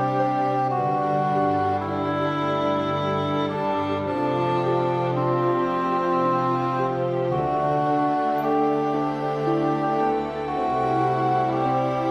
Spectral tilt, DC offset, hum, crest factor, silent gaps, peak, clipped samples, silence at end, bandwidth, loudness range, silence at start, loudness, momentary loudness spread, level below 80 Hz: -8 dB/octave; under 0.1%; none; 12 dB; none; -10 dBFS; under 0.1%; 0 s; 13 kHz; 1 LU; 0 s; -23 LUFS; 3 LU; -56 dBFS